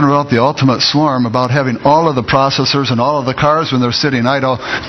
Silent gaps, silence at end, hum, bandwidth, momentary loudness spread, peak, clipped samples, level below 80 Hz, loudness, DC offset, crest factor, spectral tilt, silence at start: none; 0 s; none; 6.4 kHz; 3 LU; 0 dBFS; under 0.1%; -44 dBFS; -12 LUFS; under 0.1%; 12 dB; -5.5 dB/octave; 0 s